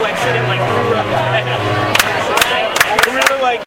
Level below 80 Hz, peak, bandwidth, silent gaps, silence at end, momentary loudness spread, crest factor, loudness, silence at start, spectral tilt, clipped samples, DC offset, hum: -44 dBFS; 0 dBFS; over 20 kHz; none; 0 s; 4 LU; 14 dB; -14 LUFS; 0 s; -3.5 dB/octave; 0.1%; under 0.1%; none